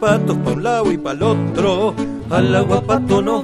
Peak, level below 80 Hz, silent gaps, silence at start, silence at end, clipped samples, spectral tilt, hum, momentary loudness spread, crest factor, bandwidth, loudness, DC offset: -2 dBFS; -42 dBFS; none; 0 s; 0 s; under 0.1%; -6.5 dB/octave; none; 4 LU; 14 dB; 13 kHz; -17 LUFS; under 0.1%